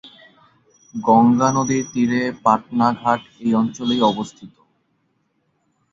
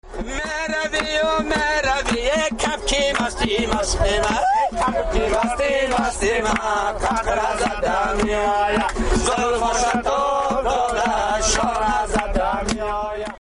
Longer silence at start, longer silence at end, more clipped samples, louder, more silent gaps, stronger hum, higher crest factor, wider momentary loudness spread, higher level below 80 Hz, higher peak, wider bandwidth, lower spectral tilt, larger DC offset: about the same, 0.05 s vs 0.05 s; first, 1.45 s vs 0.1 s; neither; about the same, -18 LUFS vs -20 LUFS; neither; neither; about the same, 18 dB vs 14 dB; first, 9 LU vs 3 LU; second, -58 dBFS vs -32 dBFS; first, -2 dBFS vs -6 dBFS; second, 7.6 kHz vs 11 kHz; first, -5.5 dB/octave vs -3 dB/octave; neither